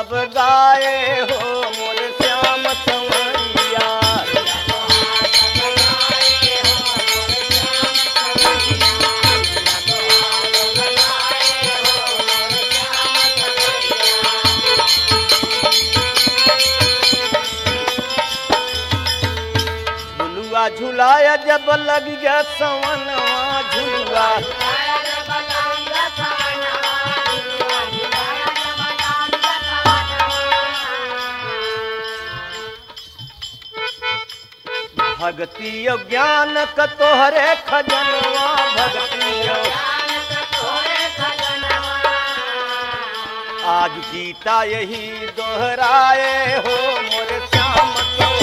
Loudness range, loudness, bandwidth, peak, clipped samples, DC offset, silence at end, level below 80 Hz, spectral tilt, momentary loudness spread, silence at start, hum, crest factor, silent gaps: 7 LU; -15 LUFS; 16 kHz; 0 dBFS; under 0.1%; under 0.1%; 0 s; -42 dBFS; -2 dB/octave; 11 LU; 0 s; none; 16 dB; none